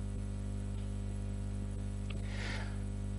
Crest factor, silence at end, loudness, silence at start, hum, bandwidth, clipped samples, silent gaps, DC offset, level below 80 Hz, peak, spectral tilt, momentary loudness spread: 10 dB; 0 s; -41 LUFS; 0 s; 50 Hz at -40 dBFS; 11.5 kHz; under 0.1%; none; under 0.1%; -42 dBFS; -28 dBFS; -6.5 dB/octave; 2 LU